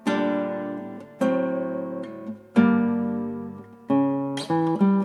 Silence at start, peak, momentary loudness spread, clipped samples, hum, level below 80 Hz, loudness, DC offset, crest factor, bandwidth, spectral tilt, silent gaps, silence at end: 0.05 s; -6 dBFS; 15 LU; under 0.1%; none; -74 dBFS; -25 LUFS; under 0.1%; 18 dB; 11.5 kHz; -7.5 dB/octave; none; 0 s